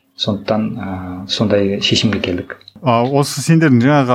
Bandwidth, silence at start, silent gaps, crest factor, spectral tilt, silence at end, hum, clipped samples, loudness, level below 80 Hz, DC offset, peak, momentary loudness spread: 15.5 kHz; 0.2 s; none; 14 dB; -5.5 dB/octave; 0 s; none; under 0.1%; -15 LUFS; -50 dBFS; under 0.1%; 0 dBFS; 13 LU